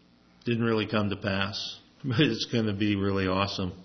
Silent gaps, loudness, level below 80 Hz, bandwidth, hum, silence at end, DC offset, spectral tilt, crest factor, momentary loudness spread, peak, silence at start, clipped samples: none; -28 LUFS; -62 dBFS; 6.4 kHz; none; 0 s; under 0.1%; -6 dB/octave; 20 dB; 8 LU; -8 dBFS; 0.45 s; under 0.1%